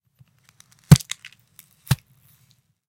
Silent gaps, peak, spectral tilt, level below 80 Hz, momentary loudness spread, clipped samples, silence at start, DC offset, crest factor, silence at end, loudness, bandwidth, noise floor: none; 0 dBFS; -5.5 dB/octave; -44 dBFS; 18 LU; under 0.1%; 0.9 s; under 0.1%; 24 dB; 0.95 s; -19 LUFS; 17 kHz; -62 dBFS